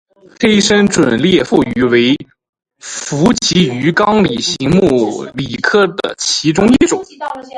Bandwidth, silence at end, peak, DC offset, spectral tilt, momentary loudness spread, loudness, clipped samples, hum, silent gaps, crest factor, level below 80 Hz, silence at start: 11.5 kHz; 0 s; 0 dBFS; under 0.1%; -4.5 dB/octave; 10 LU; -12 LUFS; under 0.1%; none; 2.49-2.53 s; 12 dB; -42 dBFS; 0.4 s